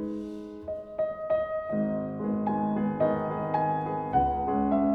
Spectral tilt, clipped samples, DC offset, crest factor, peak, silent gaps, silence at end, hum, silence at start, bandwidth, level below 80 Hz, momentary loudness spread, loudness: -10 dB/octave; under 0.1%; under 0.1%; 16 dB; -14 dBFS; none; 0 s; none; 0 s; 4.8 kHz; -50 dBFS; 10 LU; -29 LUFS